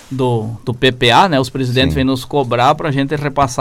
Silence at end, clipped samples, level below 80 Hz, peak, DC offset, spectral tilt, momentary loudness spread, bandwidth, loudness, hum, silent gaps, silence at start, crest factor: 0 s; under 0.1%; -36 dBFS; -2 dBFS; under 0.1%; -5.5 dB/octave; 7 LU; 16 kHz; -14 LUFS; none; none; 0.1 s; 12 dB